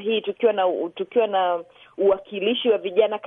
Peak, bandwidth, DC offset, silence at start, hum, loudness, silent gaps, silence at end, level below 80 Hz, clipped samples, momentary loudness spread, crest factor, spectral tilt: -6 dBFS; 3.8 kHz; under 0.1%; 0 s; none; -22 LUFS; none; 0 s; -66 dBFS; under 0.1%; 5 LU; 16 dB; -7.5 dB/octave